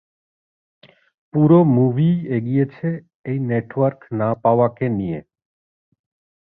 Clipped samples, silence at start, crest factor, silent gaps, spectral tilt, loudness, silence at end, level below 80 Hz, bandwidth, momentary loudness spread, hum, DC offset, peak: under 0.1%; 1.35 s; 18 dB; 3.15-3.24 s; -13 dB/octave; -19 LUFS; 1.35 s; -56 dBFS; 4.1 kHz; 13 LU; none; under 0.1%; -2 dBFS